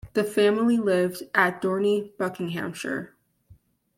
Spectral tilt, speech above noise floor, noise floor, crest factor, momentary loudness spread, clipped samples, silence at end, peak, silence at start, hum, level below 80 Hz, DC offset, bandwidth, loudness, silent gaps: -5.5 dB/octave; 33 dB; -57 dBFS; 22 dB; 10 LU; under 0.1%; 0.9 s; -4 dBFS; 0.05 s; none; -62 dBFS; under 0.1%; 16.5 kHz; -25 LUFS; none